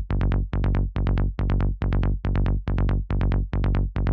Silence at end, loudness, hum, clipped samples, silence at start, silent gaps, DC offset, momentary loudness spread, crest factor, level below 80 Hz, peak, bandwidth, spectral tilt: 0 s; -25 LUFS; none; under 0.1%; 0 s; none; under 0.1%; 1 LU; 14 dB; -24 dBFS; -8 dBFS; 4.8 kHz; -10 dB/octave